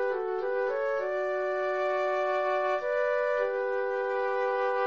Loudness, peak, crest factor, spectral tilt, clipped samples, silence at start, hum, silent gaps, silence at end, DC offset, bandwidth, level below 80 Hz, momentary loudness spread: -29 LUFS; -16 dBFS; 12 dB; -4 dB/octave; under 0.1%; 0 s; none; none; 0 s; 0.1%; 7.2 kHz; -70 dBFS; 2 LU